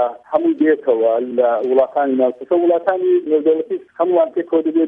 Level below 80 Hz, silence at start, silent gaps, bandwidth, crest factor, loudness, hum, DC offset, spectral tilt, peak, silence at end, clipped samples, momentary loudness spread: -68 dBFS; 0 s; none; 3.8 kHz; 14 dB; -17 LUFS; none; under 0.1%; -8.5 dB/octave; -2 dBFS; 0 s; under 0.1%; 3 LU